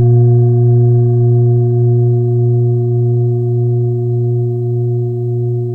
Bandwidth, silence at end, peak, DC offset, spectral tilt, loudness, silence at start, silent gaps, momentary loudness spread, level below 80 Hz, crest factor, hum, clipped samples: 1.2 kHz; 0 s; -2 dBFS; under 0.1%; -14 dB/octave; -13 LUFS; 0 s; none; 6 LU; -48 dBFS; 10 dB; none; under 0.1%